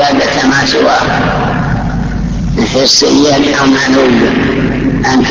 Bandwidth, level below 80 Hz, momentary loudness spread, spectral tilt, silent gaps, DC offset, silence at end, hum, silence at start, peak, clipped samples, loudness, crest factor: 8 kHz; -24 dBFS; 8 LU; -4.5 dB/octave; none; under 0.1%; 0 s; none; 0 s; 0 dBFS; under 0.1%; -9 LUFS; 10 dB